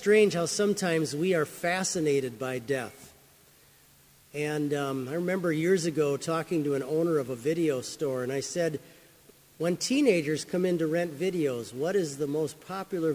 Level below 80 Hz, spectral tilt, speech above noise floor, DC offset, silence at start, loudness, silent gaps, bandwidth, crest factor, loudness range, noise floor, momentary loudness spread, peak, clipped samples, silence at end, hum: -70 dBFS; -5 dB/octave; 31 dB; under 0.1%; 0 s; -29 LUFS; none; 16 kHz; 18 dB; 4 LU; -59 dBFS; 8 LU; -10 dBFS; under 0.1%; 0 s; none